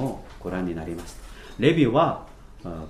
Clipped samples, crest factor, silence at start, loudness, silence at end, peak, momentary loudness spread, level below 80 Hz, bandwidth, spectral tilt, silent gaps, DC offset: under 0.1%; 20 dB; 0 s; -24 LUFS; 0 s; -4 dBFS; 22 LU; -44 dBFS; 14.5 kHz; -7 dB/octave; none; under 0.1%